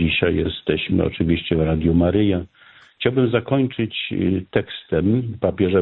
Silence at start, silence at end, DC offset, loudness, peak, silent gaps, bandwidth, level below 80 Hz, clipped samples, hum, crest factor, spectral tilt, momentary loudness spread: 0 s; 0 s; under 0.1%; -20 LUFS; -4 dBFS; none; 4.2 kHz; -38 dBFS; under 0.1%; none; 16 dB; -10.5 dB/octave; 6 LU